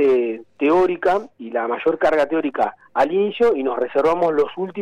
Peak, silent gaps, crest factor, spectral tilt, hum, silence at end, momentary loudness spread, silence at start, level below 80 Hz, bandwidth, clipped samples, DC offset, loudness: -8 dBFS; none; 12 dB; -6.5 dB/octave; none; 0 s; 7 LU; 0 s; -54 dBFS; 9.4 kHz; under 0.1%; under 0.1%; -20 LUFS